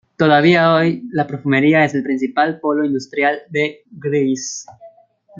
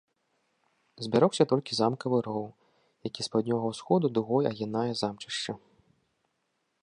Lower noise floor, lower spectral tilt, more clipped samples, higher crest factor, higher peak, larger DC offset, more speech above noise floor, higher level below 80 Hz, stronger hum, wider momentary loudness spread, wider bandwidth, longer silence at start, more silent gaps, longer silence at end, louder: second, -48 dBFS vs -78 dBFS; about the same, -5.5 dB/octave vs -6 dB/octave; neither; second, 16 dB vs 22 dB; first, 0 dBFS vs -8 dBFS; neither; second, 32 dB vs 50 dB; first, -62 dBFS vs -72 dBFS; neither; second, 10 LU vs 13 LU; second, 7.6 kHz vs 10.5 kHz; second, 0.2 s vs 1 s; neither; second, 0.5 s vs 1.25 s; first, -16 LUFS vs -29 LUFS